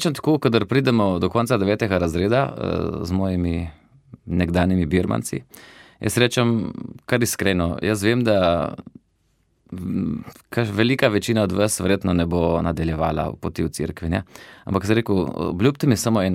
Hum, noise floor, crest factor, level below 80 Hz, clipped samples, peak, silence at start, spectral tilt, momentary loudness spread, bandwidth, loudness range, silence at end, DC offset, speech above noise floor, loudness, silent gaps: none; -65 dBFS; 20 dB; -42 dBFS; under 0.1%; -2 dBFS; 0 s; -5.5 dB/octave; 10 LU; 16 kHz; 3 LU; 0 s; under 0.1%; 44 dB; -21 LUFS; none